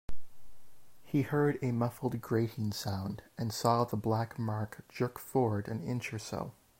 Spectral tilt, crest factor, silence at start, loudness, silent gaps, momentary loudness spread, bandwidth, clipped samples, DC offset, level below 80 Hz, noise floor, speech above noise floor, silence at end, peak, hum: -6.5 dB/octave; 20 dB; 0.1 s; -34 LUFS; none; 9 LU; 16 kHz; under 0.1%; under 0.1%; -58 dBFS; -53 dBFS; 20 dB; 0.3 s; -14 dBFS; none